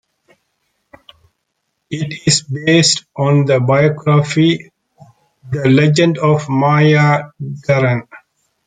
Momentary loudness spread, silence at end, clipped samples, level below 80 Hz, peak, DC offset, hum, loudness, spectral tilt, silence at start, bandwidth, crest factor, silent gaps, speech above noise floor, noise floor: 12 LU; 0.5 s; under 0.1%; -54 dBFS; 0 dBFS; under 0.1%; none; -13 LUFS; -5 dB/octave; 1.9 s; 9.6 kHz; 14 dB; none; 58 dB; -71 dBFS